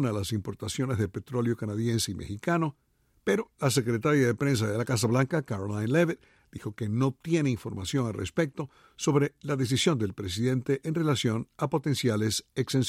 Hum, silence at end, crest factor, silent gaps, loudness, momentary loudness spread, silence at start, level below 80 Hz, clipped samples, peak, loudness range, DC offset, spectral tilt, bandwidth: none; 0 s; 16 dB; none; -28 LUFS; 8 LU; 0 s; -58 dBFS; under 0.1%; -12 dBFS; 3 LU; under 0.1%; -5.5 dB/octave; 15.5 kHz